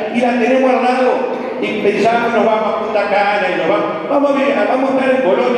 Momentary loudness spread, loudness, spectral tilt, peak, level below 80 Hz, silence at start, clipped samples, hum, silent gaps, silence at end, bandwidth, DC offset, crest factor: 4 LU; -14 LUFS; -5.5 dB/octave; -2 dBFS; -58 dBFS; 0 s; under 0.1%; none; none; 0 s; 10 kHz; under 0.1%; 12 dB